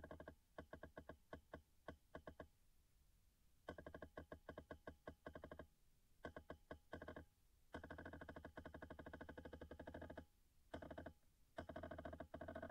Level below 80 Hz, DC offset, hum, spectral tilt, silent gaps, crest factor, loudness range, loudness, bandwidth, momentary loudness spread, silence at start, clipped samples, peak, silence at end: -70 dBFS; under 0.1%; none; -6.5 dB/octave; none; 20 dB; 4 LU; -59 LUFS; 15.5 kHz; 7 LU; 0 s; under 0.1%; -38 dBFS; 0 s